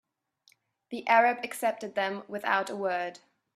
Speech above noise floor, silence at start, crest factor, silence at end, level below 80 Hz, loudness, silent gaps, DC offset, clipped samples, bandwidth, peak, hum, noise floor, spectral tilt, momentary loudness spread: 39 dB; 0.9 s; 22 dB; 0.4 s; -82 dBFS; -29 LUFS; none; under 0.1%; under 0.1%; 14.5 kHz; -8 dBFS; none; -67 dBFS; -3.5 dB/octave; 13 LU